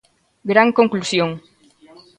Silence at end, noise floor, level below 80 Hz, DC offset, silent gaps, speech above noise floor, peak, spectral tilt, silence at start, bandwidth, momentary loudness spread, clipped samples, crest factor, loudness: 0.8 s; -48 dBFS; -62 dBFS; under 0.1%; none; 32 dB; 0 dBFS; -5 dB/octave; 0.45 s; 10.5 kHz; 16 LU; under 0.1%; 20 dB; -17 LUFS